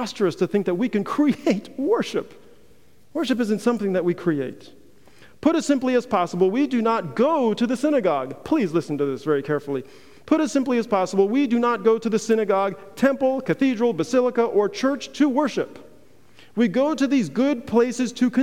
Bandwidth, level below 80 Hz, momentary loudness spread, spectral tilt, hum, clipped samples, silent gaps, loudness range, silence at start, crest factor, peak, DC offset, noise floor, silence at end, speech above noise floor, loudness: 15.5 kHz; -64 dBFS; 5 LU; -6 dB/octave; none; under 0.1%; none; 3 LU; 0 s; 16 dB; -6 dBFS; 0.4%; -56 dBFS; 0 s; 35 dB; -22 LUFS